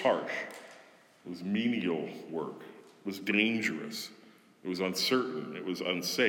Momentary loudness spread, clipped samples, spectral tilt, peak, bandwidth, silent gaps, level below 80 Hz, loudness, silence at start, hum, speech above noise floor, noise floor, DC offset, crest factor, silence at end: 17 LU; under 0.1%; -4 dB/octave; -12 dBFS; 18 kHz; none; -86 dBFS; -33 LUFS; 0 s; none; 26 dB; -58 dBFS; under 0.1%; 22 dB; 0 s